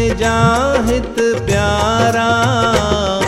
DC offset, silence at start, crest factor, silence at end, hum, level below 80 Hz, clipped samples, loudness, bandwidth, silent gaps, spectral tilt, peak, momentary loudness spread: under 0.1%; 0 s; 12 dB; 0 s; none; -28 dBFS; under 0.1%; -14 LUFS; 16 kHz; none; -5 dB/octave; -2 dBFS; 3 LU